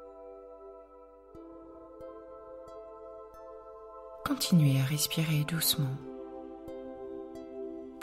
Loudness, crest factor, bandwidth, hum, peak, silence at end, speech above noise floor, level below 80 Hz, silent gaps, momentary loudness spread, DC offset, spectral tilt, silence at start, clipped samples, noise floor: -31 LUFS; 20 dB; 16 kHz; none; -14 dBFS; 0 s; 26 dB; -62 dBFS; none; 23 LU; under 0.1%; -4.5 dB/octave; 0 s; under 0.1%; -54 dBFS